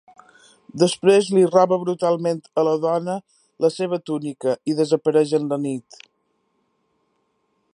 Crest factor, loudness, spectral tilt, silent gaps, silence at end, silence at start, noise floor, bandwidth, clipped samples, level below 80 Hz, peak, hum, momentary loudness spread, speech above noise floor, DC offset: 20 dB; -20 LUFS; -6 dB/octave; none; 1.95 s; 0.75 s; -69 dBFS; 11 kHz; under 0.1%; -72 dBFS; -2 dBFS; none; 11 LU; 50 dB; under 0.1%